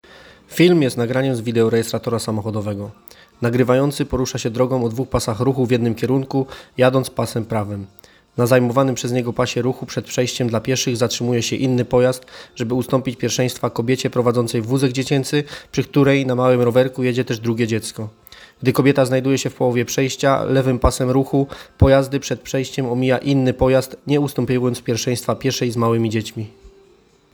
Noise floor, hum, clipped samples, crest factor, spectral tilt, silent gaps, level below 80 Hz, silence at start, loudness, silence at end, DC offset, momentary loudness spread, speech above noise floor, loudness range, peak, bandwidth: -53 dBFS; none; under 0.1%; 18 dB; -5.5 dB/octave; none; -38 dBFS; 0.5 s; -19 LUFS; 0.65 s; under 0.1%; 9 LU; 35 dB; 3 LU; 0 dBFS; 19.5 kHz